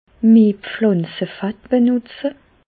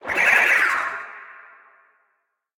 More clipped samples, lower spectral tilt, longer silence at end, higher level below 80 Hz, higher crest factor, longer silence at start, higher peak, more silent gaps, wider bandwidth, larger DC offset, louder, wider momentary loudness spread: neither; first, -12.5 dB/octave vs -1 dB/octave; second, 0.35 s vs 1.3 s; first, -56 dBFS vs -64 dBFS; second, 14 dB vs 20 dB; first, 0.25 s vs 0.05 s; about the same, -4 dBFS vs -4 dBFS; neither; second, 4.7 kHz vs 17.5 kHz; neither; about the same, -17 LUFS vs -17 LUFS; second, 15 LU vs 22 LU